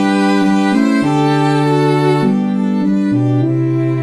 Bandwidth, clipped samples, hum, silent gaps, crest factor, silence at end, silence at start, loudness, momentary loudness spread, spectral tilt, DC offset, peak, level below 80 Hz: 11.5 kHz; under 0.1%; none; none; 12 dB; 0 s; 0 s; -13 LUFS; 3 LU; -7.5 dB/octave; under 0.1%; -2 dBFS; -56 dBFS